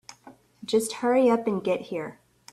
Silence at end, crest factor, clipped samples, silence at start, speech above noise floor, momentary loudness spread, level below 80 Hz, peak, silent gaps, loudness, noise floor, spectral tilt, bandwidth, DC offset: 0.4 s; 16 dB; under 0.1%; 0.1 s; 28 dB; 15 LU; -70 dBFS; -10 dBFS; none; -25 LUFS; -53 dBFS; -4.5 dB/octave; 14 kHz; under 0.1%